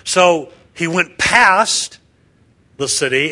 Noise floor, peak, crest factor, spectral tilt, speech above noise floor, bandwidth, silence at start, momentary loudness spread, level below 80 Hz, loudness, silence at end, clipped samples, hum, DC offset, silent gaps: -54 dBFS; 0 dBFS; 16 dB; -2 dB/octave; 39 dB; 12 kHz; 0.05 s; 14 LU; -50 dBFS; -14 LUFS; 0 s; under 0.1%; none; under 0.1%; none